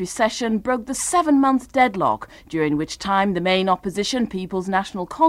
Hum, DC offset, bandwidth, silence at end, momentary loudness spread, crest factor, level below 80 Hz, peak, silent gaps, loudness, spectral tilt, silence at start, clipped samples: none; under 0.1%; 15 kHz; 0 s; 7 LU; 16 dB; -50 dBFS; -4 dBFS; none; -21 LUFS; -4.5 dB/octave; 0 s; under 0.1%